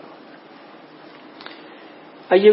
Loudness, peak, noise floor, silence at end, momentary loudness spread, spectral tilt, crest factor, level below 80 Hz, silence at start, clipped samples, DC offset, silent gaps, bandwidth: -17 LUFS; -2 dBFS; -44 dBFS; 0 s; 23 LU; -10 dB/octave; 20 dB; -82 dBFS; 2.3 s; under 0.1%; under 0.1%; none; 5.8 kHz